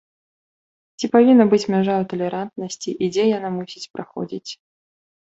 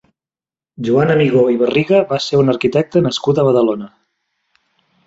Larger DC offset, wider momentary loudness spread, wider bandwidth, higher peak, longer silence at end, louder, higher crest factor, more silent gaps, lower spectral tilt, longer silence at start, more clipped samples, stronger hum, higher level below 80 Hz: neither; first, 19 LU vs 5 LU; about the same, 8 kHz vs 8 kHz; about the same, -2 dBFS vs -2 dBFS; second, 0.75 s vs 1.2 s; second, -19 LUFS vs -14 LUFS; about the same, 18 dB vs 14 dB; first, 3.90-3.94 s vs none; about the same, -6 dB/octave vs -6.5 dB/octave; first, 1 s vs 0.8 s; neither; neither; second, -64 dBFS vs -54 dBFS